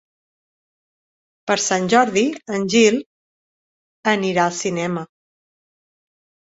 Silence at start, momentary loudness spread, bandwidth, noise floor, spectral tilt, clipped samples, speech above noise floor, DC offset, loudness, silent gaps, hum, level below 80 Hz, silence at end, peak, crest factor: 1.45 s; 11 LU; 8 kHz; under -90 dBFS; -3.5 dB/octave; under 0.1%; over 72 dB; under 0.1%; -19 LUFS; 3.06-4.03 s; none; -64 dBFS; 1.45 s; -2 dBFS; 20 dB